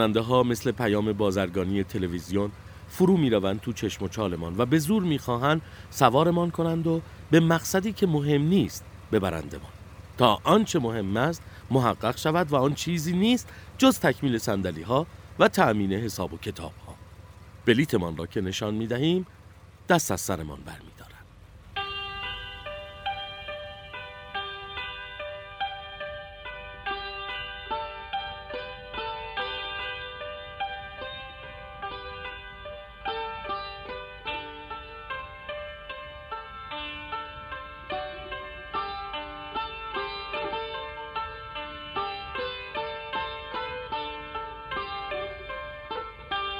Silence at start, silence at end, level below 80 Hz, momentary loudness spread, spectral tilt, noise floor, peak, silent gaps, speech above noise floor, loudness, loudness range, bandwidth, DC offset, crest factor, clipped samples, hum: 0 s; 0 s; -50 dBFS; 16 LU; -5.5 dB/octave; -50 dBFS; -2 dBFS; none; 25 dB; -28 LUFS; 12 LU; over 20 kHz; under 0.1%; 26 dB; under 0.1%; none